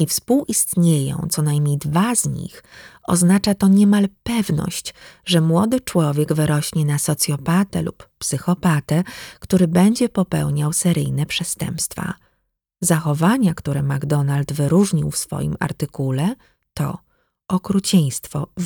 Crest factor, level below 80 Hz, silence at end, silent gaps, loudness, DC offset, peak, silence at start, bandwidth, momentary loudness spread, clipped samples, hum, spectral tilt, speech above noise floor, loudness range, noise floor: 16 dB; -48 dBFS; 0 s; none; -19 LUFS; under 0.1%; -2 dBFS; 0 s; over 20 kHz; 11 LU; under 0.1%; none; -5.5 dB/octave; 52 dB; 3 LU; -71 dBFS